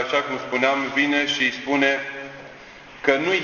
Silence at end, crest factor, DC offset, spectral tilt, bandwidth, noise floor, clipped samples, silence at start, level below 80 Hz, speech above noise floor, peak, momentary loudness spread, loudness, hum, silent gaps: 0 s; 20 dB; under 0.1%; -3.5 dB/octave; 7.2 kHz; -43 dBFS; under 0.1%; 0 s; -60 dBFS; 21 dB; -4 dBFS; 20 LU; -21 LUFS; none; none